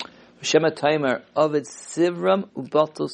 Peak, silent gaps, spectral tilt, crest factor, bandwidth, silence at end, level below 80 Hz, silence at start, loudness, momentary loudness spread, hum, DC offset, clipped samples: -4 dBFS; none; -4.5 dB/octave; 20 dB; 10.5 kHz; 0 s; -68 dBFS; 0 s; -22 LUFS; 8 LU; none; under 0.1%; under 0.1%